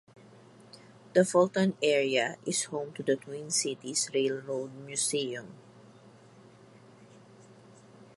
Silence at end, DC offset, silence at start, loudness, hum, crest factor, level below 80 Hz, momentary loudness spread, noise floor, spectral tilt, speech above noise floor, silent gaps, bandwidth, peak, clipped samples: 0.1 s; under 0.1%; 0.75 s; -29 LUFS; none; 22 dB; -80 dBFS; 11 LU; -55 dBFS; -3.5 dB/octave; 26 dB; none; 11.5 kHz; -10 dBFS; under 0.1%